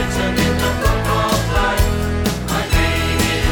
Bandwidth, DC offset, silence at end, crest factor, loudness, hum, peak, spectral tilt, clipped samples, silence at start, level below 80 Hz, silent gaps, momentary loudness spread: 20 kHz; under 0.1%; 0 s; 14 dB; -17 LUFS; none; -4 dBFS; -4.5 dB/octave; under 0.1%; 0 s; -22 dBFS; none; 3 LU